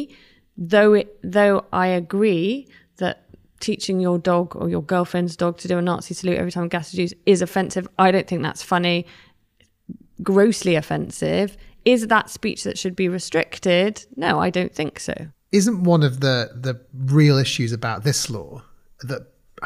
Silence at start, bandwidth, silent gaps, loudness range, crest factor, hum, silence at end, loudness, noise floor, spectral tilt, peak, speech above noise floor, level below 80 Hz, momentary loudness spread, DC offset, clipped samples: 0 s; 15.5 kHz; none; 3 LU; 16 dB; none; 0 s; -20 LUFS; -62 dBFS; -5.5 dB/octave; -4 dBFS; 41 dB; -54 dBFS; 12 LU; under 0.1%; under 0.1%